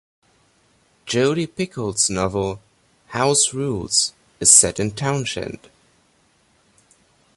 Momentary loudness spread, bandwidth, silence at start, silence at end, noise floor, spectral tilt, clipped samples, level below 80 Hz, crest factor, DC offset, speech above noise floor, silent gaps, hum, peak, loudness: 17 LU; 14 kHz; 1.05 s; 1.8 s; -60 dBFS; -2.5 dB/octave; under 0.1%; -50 dBFS; 22 dB; under 0.1%; 41 dB; none; none; 0 dBFS; -18 LUFS